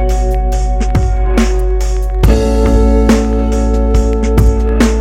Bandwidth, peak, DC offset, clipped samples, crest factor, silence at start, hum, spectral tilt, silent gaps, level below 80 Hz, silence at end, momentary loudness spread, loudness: 11.5 kHz; 0 dBFS; under 0.1%; under 0.1%; 10 dB; 0 s; none; -7 dB/octave; none; -12 dBFS; 0 s; 5 LU; -13 LUFS